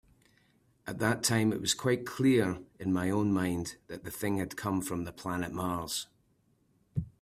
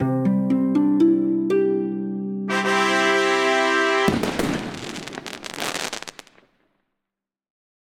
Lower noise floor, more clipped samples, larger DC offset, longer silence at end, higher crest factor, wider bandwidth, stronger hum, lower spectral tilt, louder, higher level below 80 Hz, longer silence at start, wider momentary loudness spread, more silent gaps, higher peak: second, -70 dBFS vs -85 dBFS; neither; neither; second, 0.15 s vs 1.75 s; about the same, 20 dB vs 18 dB; about the same, 16 kHz vs 17 kHz; neither; about the same, -4.5 dB/octave vs -5 dB/octave; second, -32 LUFS vs -21 LUFS; second, -60 dBFS vs -52 dBFS; first, 0.85 s vs 0 s; about the same, 12 LU vs 14 LU; neither; second, -12 dBFS vs -4 dBFS